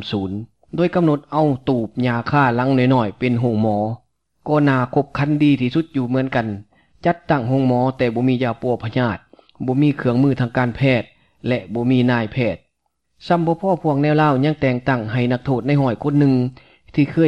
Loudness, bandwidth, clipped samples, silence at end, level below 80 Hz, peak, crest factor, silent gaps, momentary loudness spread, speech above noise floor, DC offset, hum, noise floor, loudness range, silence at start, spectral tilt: -19 LUFS; 6.6 kHz; under 0.1%; 0 s; -50 dBFS; -4 dBFS; 14 dB; none; 8 LU; 54 dB; 0.2%; none; -72 dBFS; 2 LU; 0 s; -9 dB/octave